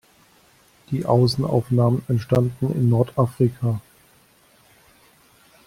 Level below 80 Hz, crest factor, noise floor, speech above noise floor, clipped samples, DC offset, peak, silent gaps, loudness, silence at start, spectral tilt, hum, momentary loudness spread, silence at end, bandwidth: -54 dBFS; 18 dB; -56 dBFS; 36 dB; under 0.1%; under 0.1%; -4 dBFS; none; -21 LUFS; 0.9 s; -8.5 dB/octave; none; 7 LU; 1.85 s; 14.5 kHz